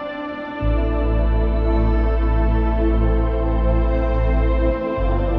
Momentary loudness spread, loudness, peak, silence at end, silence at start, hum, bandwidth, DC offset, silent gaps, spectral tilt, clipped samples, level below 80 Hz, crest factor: 3 LU; -20 LUFS; -6 dBFS; 0 s; 0 s; none; 4.2 kHz; under 0.1%; none; -10.5 dB/octave; under 0.1%; -18 dBFS; 12 dB